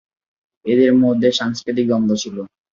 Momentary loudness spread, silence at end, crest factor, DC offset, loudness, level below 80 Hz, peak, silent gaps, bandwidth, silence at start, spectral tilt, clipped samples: 14 LU; 0.25 s; 16 dB; under 0.1%; -17 LUFS; -60 dBFS; -2 dBFS; none; 7.4 kHz; 0.65 s; -5.5 dB/octave; under 0.1%